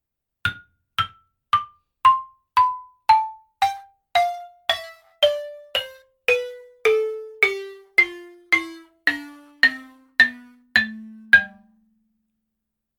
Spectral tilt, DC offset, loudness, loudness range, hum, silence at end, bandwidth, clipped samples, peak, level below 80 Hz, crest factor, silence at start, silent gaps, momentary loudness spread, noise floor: -2.5 dB/octave; under 0.1%; -21 LUFS; 3 LU; none; 1.5 s; 19 kHz; under 0.1%; -2 dBFS; -60 dBFS; 22 dB; 0.45 s; none; 15 LU; -81 dBFS